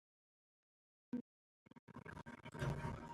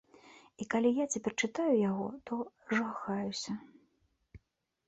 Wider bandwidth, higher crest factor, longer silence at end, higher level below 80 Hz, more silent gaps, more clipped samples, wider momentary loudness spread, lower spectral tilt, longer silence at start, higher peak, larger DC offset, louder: first, 13 kHz vs 8.4 kHz; about the same, 20 dB vs 18 dB; second, 0 s vs 0.5 s; first, -64 dBFS vs -70 dBFS; first, 1.21-1.66 s, 1.79-1.87 s vs none; neither; first, 18 LU vs 10 LU; first, -7 dB/octave vs -4.5 dB/octave; first, 1.15 s vs 0.25 s; second, -30 dBFS vs -18 dBFS; neither; second, -49 LUFS vs -34 LUFS